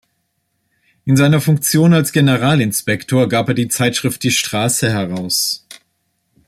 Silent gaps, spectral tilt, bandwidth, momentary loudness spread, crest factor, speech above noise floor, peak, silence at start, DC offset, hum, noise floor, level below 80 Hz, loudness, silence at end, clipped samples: none; -4.5 dB/octave; 16 kHz; 6 LU; 14 dB; 54 dB; -2 dBFS; 1.05 s; under 0.1%; none; -68 dBFS; -52 dBFS; -15 LUFS; 0.75 s; under 0.1%